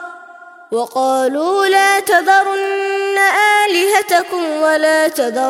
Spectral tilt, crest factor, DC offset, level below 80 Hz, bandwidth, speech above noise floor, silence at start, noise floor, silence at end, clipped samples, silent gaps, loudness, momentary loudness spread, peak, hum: -1 dB/octave; 14 dB; under 0.1%; -68 dBFS; 16.5 kHz; 24 dB; 0 s; -38 dBFS; 0 s; under 0.1%; none; -13 LUFS; 7 LU; -2 dBFS; none